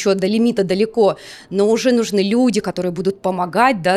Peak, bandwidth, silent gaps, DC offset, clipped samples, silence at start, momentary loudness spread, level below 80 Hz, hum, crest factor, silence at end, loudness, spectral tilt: -2 dBFS; 14 kHz; none; under 0.1%; under 0.1%; 0 s; 6 LU; -56 dBFS; none; 14 dB; 0 s; -17 LUFS; -5.5 dB/octave